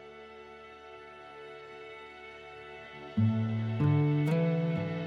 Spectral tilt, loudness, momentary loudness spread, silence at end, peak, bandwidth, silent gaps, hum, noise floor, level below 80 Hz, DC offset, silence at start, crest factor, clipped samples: -9 dB/octave; -29 LUFS; 21 LU; 0 s; -16 dBFS; 6.2 kHz; none; none; -50 dBFS; -68 dBFS; under 0.1%; 0 s; 16 dB; under 0.1%